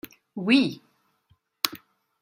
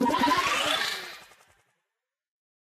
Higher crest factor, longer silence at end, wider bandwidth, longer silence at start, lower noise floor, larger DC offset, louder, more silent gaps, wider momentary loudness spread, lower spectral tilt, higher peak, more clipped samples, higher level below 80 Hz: first, 28 dB vs 18 dB; second, 0.45 s vs 1.4 s; first, 16 kHz vs 14.5 kHz; first, 0.35 s vs 0 s; second, -67 dBFS vs -86 dBFS; neither; about the same, -25 LUFS vs -25 LUFS; neither; first, 23 LU vs 18 LU; first, -4 dB/octave vs -2 dB/octave; first, 0 dBFS vs -12 dBFS; neither; second, -72 dBFS vs -60 dBFS